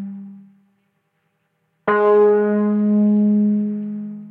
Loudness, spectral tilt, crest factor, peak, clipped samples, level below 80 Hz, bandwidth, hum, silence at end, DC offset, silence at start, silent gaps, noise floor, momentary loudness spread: -17 LUFS; -11.5 dB/octave; 14 dB; -6 dBFS; under 0.1%; -72 dBFS; 3.4 kHz; none; 0 s; under 0.1%; 0 s; none; -69 dBFS; 15 LU